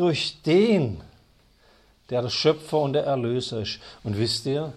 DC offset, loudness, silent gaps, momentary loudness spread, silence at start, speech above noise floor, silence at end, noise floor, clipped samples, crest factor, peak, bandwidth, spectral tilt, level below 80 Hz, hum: under 0.1%; -24 LUFS; none; 11 LU; 0 s; 35 dB; 0 s; -58 dBFS; under 0.1%; 16 dB; -8 dBFS; 13 kHz; -5.5 dB/octave; -56 dBFS; none